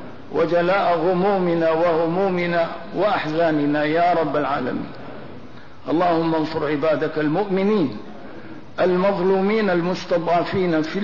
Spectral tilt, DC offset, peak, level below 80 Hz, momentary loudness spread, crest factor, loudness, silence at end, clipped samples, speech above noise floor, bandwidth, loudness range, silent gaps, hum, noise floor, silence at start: -7.5 dB/octave; 1%; -10 dBFS; -56 dBFS; 17 LU; 10 dB; -20 LUFS; 0 s; under 0.1%; 22 dB; 6 kHz; 2 LU; none; none; -41 dBFS; 0 s